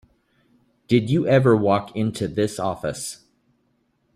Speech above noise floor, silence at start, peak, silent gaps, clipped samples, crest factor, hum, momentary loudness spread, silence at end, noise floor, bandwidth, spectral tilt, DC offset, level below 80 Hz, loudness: 47 dB; 0.9 s; -4 dBFS; none; under 0.1%; 20 dB; none; 13 LU; 1 s; -67 dBFS; 13.5 kHz; -6.5 dB/octave; under 0.1%; -56 dBFS; -21 LUFS